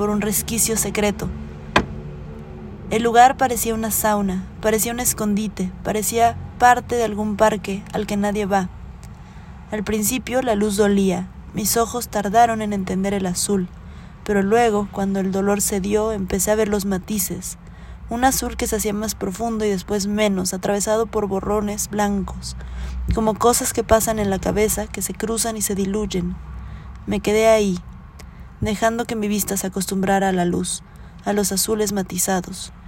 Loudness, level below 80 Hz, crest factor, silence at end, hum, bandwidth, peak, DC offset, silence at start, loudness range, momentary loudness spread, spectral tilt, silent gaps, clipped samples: -20 LUFS; -38 dBFS; 20 dB; 0 s; none; 16.5 kHz; 0 dBFS; under 0.1%; 0 s; 3 LU; 15 LU; -4 dB/octave; none; under 0.1%